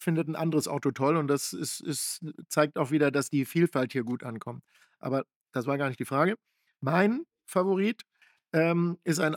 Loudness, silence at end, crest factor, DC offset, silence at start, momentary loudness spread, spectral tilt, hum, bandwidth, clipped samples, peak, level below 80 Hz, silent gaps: -29 LUFS; 0 s; 20 dB; under 0.1%; 0 s; 11 LU; -5.5 dB/octave; none; 18.5 kHz; under 0.1%; -8 dBFS; -86 dBFS; 5.36-5.41 s